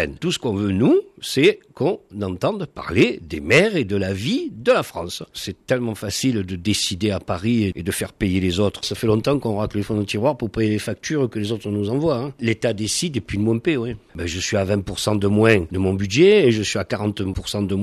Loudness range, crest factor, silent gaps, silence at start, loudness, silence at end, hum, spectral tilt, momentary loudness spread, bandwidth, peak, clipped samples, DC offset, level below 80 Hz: 4 LU; 18 dB; none; 0 s; -21 LUFS; 0 s; none; -5 dB/octave; 9 LU; 14 kHz; -2 dBFS; under 0.1%; under 0.1%; -44 dBFS